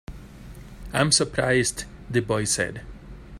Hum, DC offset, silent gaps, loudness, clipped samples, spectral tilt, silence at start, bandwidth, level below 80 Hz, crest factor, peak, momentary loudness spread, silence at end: none; under 0.1%; none; -23 LUFS; under 0.1%; -3.5 dB/octave; 0.1 s; 16 kHz; -44 dBFS; 22 dB; -4 dBFS; 24 LU; 0 s